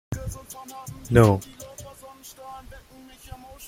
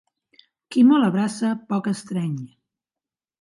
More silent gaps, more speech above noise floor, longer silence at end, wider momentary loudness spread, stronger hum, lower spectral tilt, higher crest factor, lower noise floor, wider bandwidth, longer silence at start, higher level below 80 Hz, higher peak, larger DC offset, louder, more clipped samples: neither; second, 21 dB vs over 70 dB; second, 0 s vs 0.95 s; first, 26 LU vs 13 LU; neither; about the same, -7 dB/octave vs -6.5 dB/octave; first, 24 dB vs 16 dB; second, -44 dBFS vs under -90 dBFS; first, 16 kHz vs 11.5 kHz; second, 0.1 s vs 0.7 s; first, -44 dBFS vs -72 dBFS; first, -2 dBFS vs -6 dBFS; neither; about the same, -21 LUFS vs -21 LUFS; neither